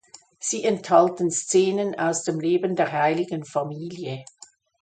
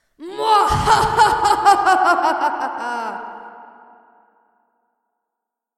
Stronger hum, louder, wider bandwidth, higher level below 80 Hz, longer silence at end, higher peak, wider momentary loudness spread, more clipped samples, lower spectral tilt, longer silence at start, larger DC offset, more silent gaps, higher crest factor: neither; second, -23 LUFS vs -16 LUFS; second, 9.4 kHz vs 14 kHz; second, -72 dBFS vs -40 dBFS; second, 0.6 s vs 2.15 s; second, -4 dBFS vs 0 dBFS; second, 13 LU vs 17 LU; neither; about the same, -4.5 dB/octave vs -3.5 dB/octave; first, 0.4 s vs 0.2 s; neither; neither; about the same, 20 dB vs 18 dB